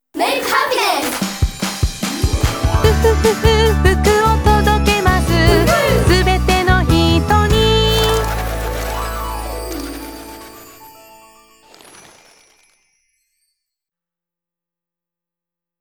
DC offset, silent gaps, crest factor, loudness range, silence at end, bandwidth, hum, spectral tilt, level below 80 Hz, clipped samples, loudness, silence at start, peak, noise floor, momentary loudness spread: under 0.1%; none; 16 dB; 14 LU; 4.9 s; over 20 kHz; none; -5 dB/octave; -22 dBFS; under 0.1%; -15 LUFS; 0.15 s; 0 dBFS; -88 dBFS; 12 LU